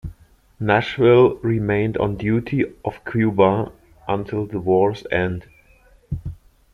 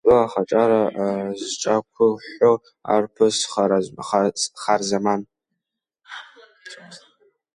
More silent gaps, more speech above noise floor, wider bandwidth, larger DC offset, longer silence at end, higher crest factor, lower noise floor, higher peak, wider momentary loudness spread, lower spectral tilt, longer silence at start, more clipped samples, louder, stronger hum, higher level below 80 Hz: neither; second, 34 dB vs 63 dB; second, 6.6 kHz vs 11 kHz; neither; second, 0.4 s vs 0.55 s; about the same, 18 dB vs 18 dB; second, -53 dBFS vs -83 dBFS; about the same, -2 dBFS vs -4 dBFS; second, 16 LU vs 20 LU; first, -8.5 dB/octave vs -4 dB/octave; about the same, 0.05 s vs 0.05 s; neither; about the same, -20 LUFS vs -21 LUFS; neither; first, -44 dBFS vs -60 dBFS